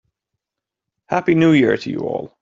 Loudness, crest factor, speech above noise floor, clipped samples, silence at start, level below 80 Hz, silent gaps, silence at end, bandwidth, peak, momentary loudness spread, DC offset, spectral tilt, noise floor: -17 LUFS; 16 dB; 68 dB; under 0.1%; 1.1 s; -58 dBFS; none; 0.15 s; 7.6 kHz; -4 dBFS; 11 LU; under 0.1%; -7.5 dB/octave; -85 dBFS